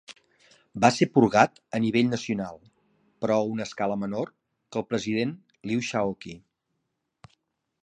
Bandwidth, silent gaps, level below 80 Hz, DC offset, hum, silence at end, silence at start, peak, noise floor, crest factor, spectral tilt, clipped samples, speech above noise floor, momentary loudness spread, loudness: 10 kHz; none; -64 dBFS; under 0.1%; none; 1.45 s; 0.1 s; -2 dBFS; -79 dBFS; 26 dB; -5.5 dB/octave; under 0.1%; 54 dB; 16 LU; -26 LUFS